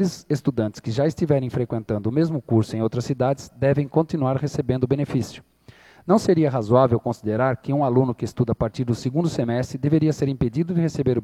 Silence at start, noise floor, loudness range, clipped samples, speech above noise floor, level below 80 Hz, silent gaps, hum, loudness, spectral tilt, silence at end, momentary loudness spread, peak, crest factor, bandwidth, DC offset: 0 s; -50 dBFS; 2 LU; under 0.1%; 28 dB; -50 dBFS; none; none; -22 LUFS; -8 dB/octave; 0 s; 6 LU; -2 dBFS; 20 dB; 13 kHz; under 0.1%